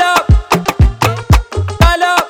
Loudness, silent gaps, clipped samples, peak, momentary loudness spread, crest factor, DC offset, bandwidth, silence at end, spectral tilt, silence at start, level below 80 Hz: -12 LUFS; none; 0.2%; 0 dBFS; 5 LU; 10 dB; under 0.1%; 19 kHz; 0 s; -5 dB/octave; 0 s; -16 dBFS